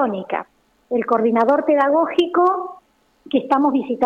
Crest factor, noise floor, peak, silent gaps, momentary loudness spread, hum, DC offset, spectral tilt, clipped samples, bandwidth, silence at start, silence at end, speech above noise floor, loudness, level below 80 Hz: 12 dB; -54 dBFS; -6 dBFS; none; 10 LU; none; under 0.1%; -7 dB/octave; under 0.1%; 8.2 kHz; 0 s; 0 s; 36 dB; -18 LUFS; -66 dBFS